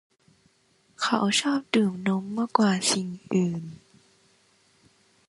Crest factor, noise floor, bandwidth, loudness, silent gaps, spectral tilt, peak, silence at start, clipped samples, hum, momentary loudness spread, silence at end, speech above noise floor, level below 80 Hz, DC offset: 22 dB; -65 dBFS; 11.5 kHz; -25 LUFS; none; -4 dB/octave; -6 dBFS; 1 s; under 0.1%; none; 8 LU; 1.55 s; 40 dB; -70 dBFS; under 0.1%